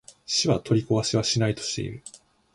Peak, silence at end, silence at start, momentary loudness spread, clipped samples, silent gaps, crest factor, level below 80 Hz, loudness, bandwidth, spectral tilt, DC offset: -10 dBFS; 0.4 s; 0.3 s; 13 LU; under 0.1%; none; 16 dB; -54 dBFS; -24 LUFS; 11.5 kHz; -4.5 dB/octave; under 0.1%